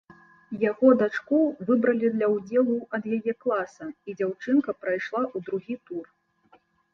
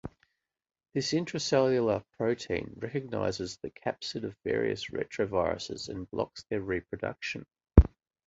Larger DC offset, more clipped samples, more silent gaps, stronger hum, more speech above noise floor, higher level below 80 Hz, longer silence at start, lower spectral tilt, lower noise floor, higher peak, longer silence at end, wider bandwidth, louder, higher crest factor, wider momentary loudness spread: neither; neither; neither; neither; second, 37 dB vs 42 dB; second, -72 dBFS vs -38 dBFS; first, 0.5 s vs 0.05 s; first, -7.5 dB/octave vs -6 dB/octave; second, -62 dBFS vs -73 dBFS; about the same, -6 dBFS vs -4 dBFS; first, 0.9 s vs 0.4 s; second, 6.8 kHz vs 8 kHz; first, -25 LUFS vs -31 LUFS; second, 20 dB vs 28 dB; about the same, 14 LU vs 12 LU